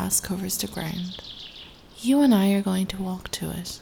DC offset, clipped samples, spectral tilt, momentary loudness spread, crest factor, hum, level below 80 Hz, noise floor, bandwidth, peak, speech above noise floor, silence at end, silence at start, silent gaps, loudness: under 0.1%; under 0.1%; -4.5 dB/octave; 19 LU; 16 dB; none; -50 dBFS; -45 dBFS; 19.5 kHz; -8 dBFS; 21 dB; 0 s; 0 s; none; -25 LUFS